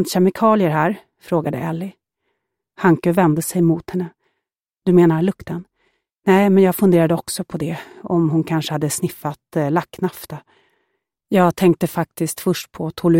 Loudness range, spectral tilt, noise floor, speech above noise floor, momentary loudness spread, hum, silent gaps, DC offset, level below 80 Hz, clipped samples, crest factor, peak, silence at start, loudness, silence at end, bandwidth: 5 LU; -6.5 dB/octave; -80 dBFS; 62 dB; 14 LU; none; none; under 0.1%; -56 dBFS; under 0.1%; 16 dB; -2 dBFS; 0 s; -18 LUFS; 0 s; 17 kHz